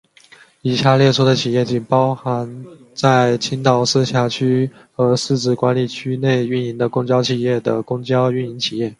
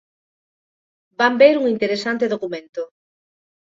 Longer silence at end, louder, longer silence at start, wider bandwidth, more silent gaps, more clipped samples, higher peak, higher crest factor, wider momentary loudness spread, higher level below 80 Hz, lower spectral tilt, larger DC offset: second, 0.05 s vs 0.75 s; about the same, -17 LUFS vs -18 LUFS; second, 0.65 s vs 1.2 s; first, 11.5 kHz vs 7.8 kHz; second, none vs 2.69-2.73 s; neither; about the same, 0 dBFS vs 0 dBFS; about the same, 18 dB vs 20 dB; second, 8 LU vs 18 LU; first, -58 dBFS vs -68 dBFS; about the same, -6 dB/octave vs -5 dB/octave; neither